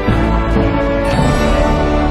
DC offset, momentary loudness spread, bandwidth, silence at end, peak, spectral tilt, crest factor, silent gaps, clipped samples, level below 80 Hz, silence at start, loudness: under 0.1%; 1 LU; 13.5 kHz; 0 s; 0 dBFS; -7 dB/octave; 12 dB; none; under 0.1%; -18 dBFS; 0 s; -14 LUFS